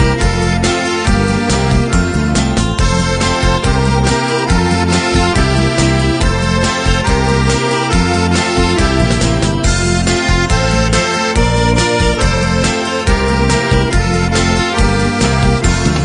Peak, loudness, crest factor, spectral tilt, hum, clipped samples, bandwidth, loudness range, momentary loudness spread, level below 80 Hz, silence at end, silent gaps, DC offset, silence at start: 0 dBFS; -13 LUFS; 12 dB; -5 dB/octave; none; under 0.1%; 10.5 kHz; 1 LU; 2 LU; -20 dBFS; 0 s; none; under 0.1%; 0 s